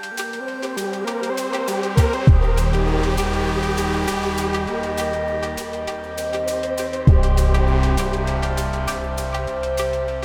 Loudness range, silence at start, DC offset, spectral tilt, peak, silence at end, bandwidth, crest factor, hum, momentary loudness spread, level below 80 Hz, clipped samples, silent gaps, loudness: 4 LU; 0 s; under 0.1%; -6 dB/octave; 0 dBFS; 0 s; 18 kHz; 18 dB; none; 10 LU; -22 dBFS; under 0.1%; none; -21 LUFS